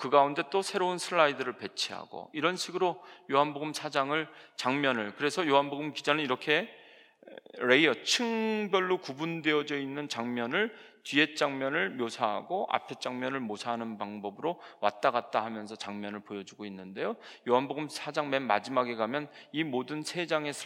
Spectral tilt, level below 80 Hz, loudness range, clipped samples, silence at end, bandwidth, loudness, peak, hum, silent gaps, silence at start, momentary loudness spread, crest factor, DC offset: -3.5 dB/octave; under -90 dBFS; 5 LU; under 0.1%; 0 s; 17 kHz; -31 LUFS; -8 dBFS; none; none; 0 s; 12 LU; 22 dB; under 0.1%